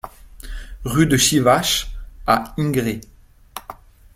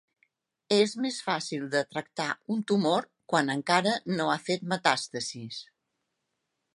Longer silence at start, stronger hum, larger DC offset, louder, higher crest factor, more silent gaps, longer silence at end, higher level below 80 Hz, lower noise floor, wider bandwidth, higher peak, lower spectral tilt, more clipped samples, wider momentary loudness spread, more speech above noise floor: second, 0.05 s vs 0.7 s; neither; neither; first, -18 LUFS vs -28 LUFS; about the same, 20 dB vs 24 dB; neither; second, 0.45 s vs 1.15 s; first, -36 dBFS vs -78 dBFS; second, -41 dBFS vs -82 dBFS; first, 16.5 kHz vs 11.5 kHz; first, -2 dBFS vs -6 dBFS; about the same, -4 dB/octave vs -4 dB/octave; neither; first, 23 LU vs 9 LU; second, 23 dB vs 53 dB